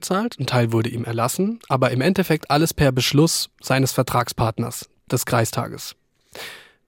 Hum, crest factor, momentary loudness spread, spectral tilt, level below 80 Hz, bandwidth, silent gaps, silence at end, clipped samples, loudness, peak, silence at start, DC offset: none; 18 dB; 16 LU; -5 dB/octave; -48 dBFS; 17 kHz; none; 0.3 s; under 0.1%; -21 LUFS; -2 dBFS; 0 s; under 0.1%